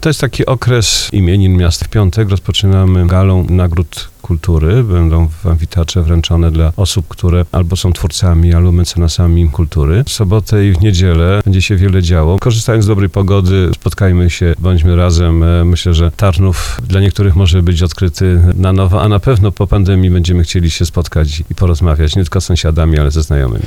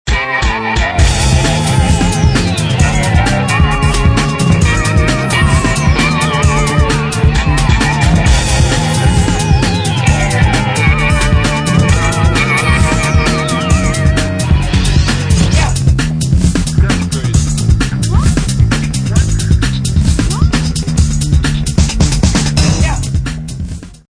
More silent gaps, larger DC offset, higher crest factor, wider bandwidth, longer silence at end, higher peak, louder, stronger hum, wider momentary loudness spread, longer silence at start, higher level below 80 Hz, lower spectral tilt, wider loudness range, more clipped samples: neither; neither; about the same, 10 dB vs 10 dB; first, 13.5 kHz vs 10.5 kHz; second, 0 s vs 0.15 s; about the same, 0 dBFS vs 0 dBFS; about the same, -11 LUFS vs -12 LUFS; neither; about the same, 4 LU vs 3 LU; about the same, 0 s vs 0.05 s; about the same, -18 dBFS vs -16 dBFS; about the same, -6 dB/octave vs -5 dB/octave; about the same, 2 LU vs 2 LU; neither